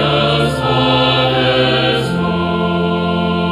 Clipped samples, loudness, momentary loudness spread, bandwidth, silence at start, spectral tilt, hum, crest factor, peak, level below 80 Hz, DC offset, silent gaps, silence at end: under 0.1%; -14 LUFS; 4 LU; 14 kHz; 0 s; -6.5 dB/octave; none; 14 dB; 0 dBFS; -36 dBFS; under 0.1%; none; 0 s